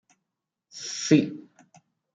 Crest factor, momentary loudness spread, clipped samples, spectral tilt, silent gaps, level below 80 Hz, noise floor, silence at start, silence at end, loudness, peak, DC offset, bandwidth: 22 dB; 23 LU; under 0.1%; -5 dB/octave; none; -78 dBFS; -84 dBFS; 0.75 s; 0.75 s; -24 LUFS; -6 dBFS; under 0.1%; 9.2 kHz